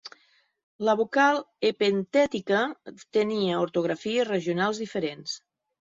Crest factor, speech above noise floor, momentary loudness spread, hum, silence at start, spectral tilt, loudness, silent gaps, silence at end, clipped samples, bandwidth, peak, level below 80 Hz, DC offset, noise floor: 18 dB; 38 dB; 10 LU; none; 0.05 s; -5 dB/octave; -26 LUFS; 0.63-0.79 s; 0.55 s; under 0.1%; 7.8 kHz; -8 dBFS; -70 dBFS; under 0.1%; -64 dBFS